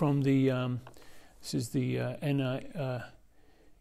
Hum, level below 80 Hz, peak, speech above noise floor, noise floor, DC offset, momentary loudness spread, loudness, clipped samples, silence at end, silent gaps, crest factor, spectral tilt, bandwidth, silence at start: none; -62 dBFS; -18 dBFS; 28 dB; -59 dBFS; under 0.1%; 14 LU; -32 LUFS; under 0.1%; 0.05 s; none; 14 dB; -7 dB/octave; 14.5 kHz; 0 s